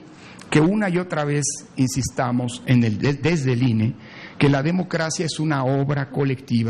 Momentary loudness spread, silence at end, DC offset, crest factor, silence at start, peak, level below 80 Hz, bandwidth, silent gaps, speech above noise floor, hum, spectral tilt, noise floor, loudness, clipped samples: 5 LU; 0 s; under 0.1%; 16 dB; 0 s; -4 dBFS; -50 dBFS; 12 kHz; none; 21 dB; none; -5.5 dB/octave; -42 dBFS; -21 LUFS; under 0.1%